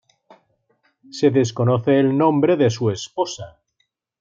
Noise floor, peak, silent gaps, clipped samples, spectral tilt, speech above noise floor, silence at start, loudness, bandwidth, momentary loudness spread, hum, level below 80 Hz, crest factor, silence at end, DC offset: -71 dBFS; -4 dBFS; none; under 0.1%; -6.5 dB/octave; 53 dB; 1.15 s; -19 LUFS; 7.6 kHz; 13 LU; none; -64 dBFS; 16 dB; 0.7 s; under 0.1%